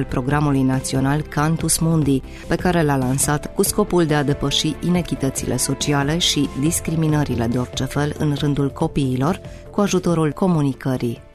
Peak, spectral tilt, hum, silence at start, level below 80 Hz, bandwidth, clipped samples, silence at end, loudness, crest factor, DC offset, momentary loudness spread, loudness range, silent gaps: -4 dBFS; -5 dB/octave; none; 0 s; -36 dBFS; 14 kHz; under 0.1%; 0.1 s; -20 LUFS; 16 dB; under 0.1%; 5 LU; 2 LU; none